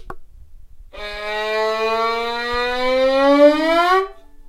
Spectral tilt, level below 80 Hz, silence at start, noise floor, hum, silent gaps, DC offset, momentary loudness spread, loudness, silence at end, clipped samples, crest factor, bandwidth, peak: -3.5 dB/octave; -40 dBFS; 0 s; -39 dBFS; none; none; under 0.1%; 15 LU; -17 LUFS; 0 s; under 0.1%; 18 dB; 15.5 kHz; -2 dBFS